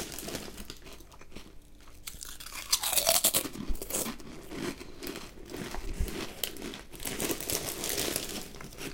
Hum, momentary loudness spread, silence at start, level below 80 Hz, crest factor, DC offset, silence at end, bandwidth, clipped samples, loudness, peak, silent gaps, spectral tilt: none; 20 LU; 0 s; -44 dBFS; 28 dB; under 0.1%; 0 s; 17 kHz; under 0.1%; -32 LUFS; -6 dBFS; none; -1.5 dB/octave